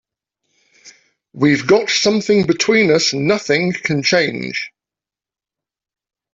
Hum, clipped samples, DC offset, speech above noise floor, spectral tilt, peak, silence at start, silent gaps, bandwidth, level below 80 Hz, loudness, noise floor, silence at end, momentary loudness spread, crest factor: none; under 0.1%; under 0.1%; 74 dB; -4 dB/octave; -2 dBFS; 0.85 s; none; 8 kHz; -56 dBFS; -15 LUFS; -89 dBFS; 1.65 s; 9 LU; 16 dB